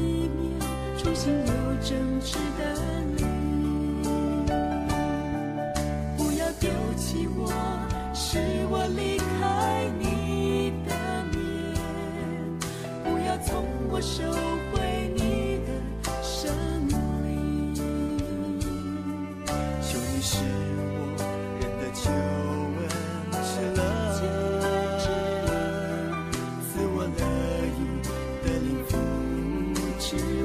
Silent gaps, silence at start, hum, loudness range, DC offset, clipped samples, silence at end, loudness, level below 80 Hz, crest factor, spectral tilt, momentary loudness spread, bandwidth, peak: none; 0 s; none; 2 LU; under 0.1%; under 0.1%; 0 s; -28 LUFS; -36 dBFS; 16 dB; -5.5 dB/octave; 4 LU; 15.5 kHz; -12 dBFS